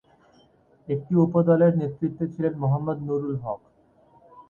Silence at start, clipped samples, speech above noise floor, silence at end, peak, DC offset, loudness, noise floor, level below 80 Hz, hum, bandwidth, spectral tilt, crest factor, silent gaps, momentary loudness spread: 0.9 s; under 0.1%; 36 dB; 0.1 s; -8 dBFS; under 0.1%; -24 LUFS; -59 dBFS; -60 dBFS; none; 3.3 kHz; -12 dB/octave; 18 dB; none; 12 LU